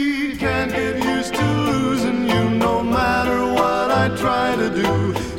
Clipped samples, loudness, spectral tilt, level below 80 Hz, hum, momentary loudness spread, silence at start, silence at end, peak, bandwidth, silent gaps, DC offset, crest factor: under 0.1%; -19 LUFS; -5.5 dB/octave; -38 dBFS; none; 3 LU; 0 s; 0 s; -4 dBFS; 16.5 kHz; none; 0.3%; 14 dB